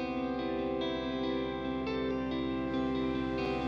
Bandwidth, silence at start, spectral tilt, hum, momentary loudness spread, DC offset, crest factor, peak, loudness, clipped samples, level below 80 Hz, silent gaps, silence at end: 7 kHz; 0 s; -7 dB/octave; none; 2 LU; under 0.1%; 12 dB; -22 dBFS; -34 LUFS; under 0.1%; -50 dBFS; none; 0 s